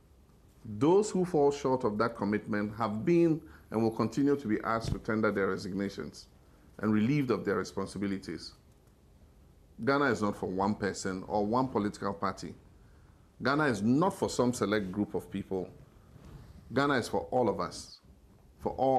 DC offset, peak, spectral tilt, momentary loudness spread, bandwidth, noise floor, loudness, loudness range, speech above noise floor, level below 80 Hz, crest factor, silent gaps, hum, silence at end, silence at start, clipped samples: under 0.1%; -16 dBFS; -6 dB/octave; 11 LU; 13.5 kHz; -60 dBFS; -31 LUFS; 4 LU; 30 dB; -56 dBFS; 16 dB; none; none; 0 s; 0.65 s; under 0.1%